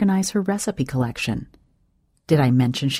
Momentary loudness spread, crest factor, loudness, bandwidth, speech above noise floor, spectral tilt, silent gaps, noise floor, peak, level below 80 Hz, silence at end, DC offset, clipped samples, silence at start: 8 LU; 18 dB; -22 LUFS; 16 kHz; 44 dB; -5.5 dB/octave; none; -64 dBFS; -4 dBFS; -50 dBFS; 0 s; under 0.1%; under 0.1%; 0 s